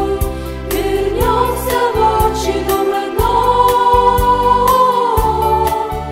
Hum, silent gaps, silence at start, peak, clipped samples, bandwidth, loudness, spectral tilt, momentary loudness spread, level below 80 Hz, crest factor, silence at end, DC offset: none; none; 0 s; 0 dBFS; under 0.1%; 16.5 kHz; -14 LUFS; -5 dB/octave; 8 LU; -24 dBFS; 12 dB; 0 s; under 0.1%